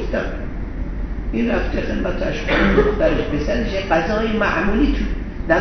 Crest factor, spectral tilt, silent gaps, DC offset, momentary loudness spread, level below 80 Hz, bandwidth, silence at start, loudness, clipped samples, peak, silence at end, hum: 18 dB; -5 dB/octave; none; 0.2%; 12 LU; -24 dBFS; 6.4 kHz; 0 s; -20 LUFS; under 0.1%; 0 dBFS; 0 s; none